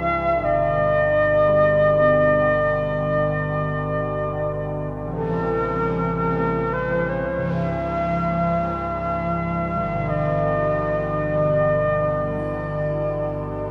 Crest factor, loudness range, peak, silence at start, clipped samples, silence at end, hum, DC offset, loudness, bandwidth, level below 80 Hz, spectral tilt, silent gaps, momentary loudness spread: 14 dB; 5 LU; -6 dBFS; 0 s; under 0.1%; 0 s; none; under 0.1%; -21 LUFS; 5.8 kHz; -38 dBFS; -9.5 dB/octave; none; 8 LU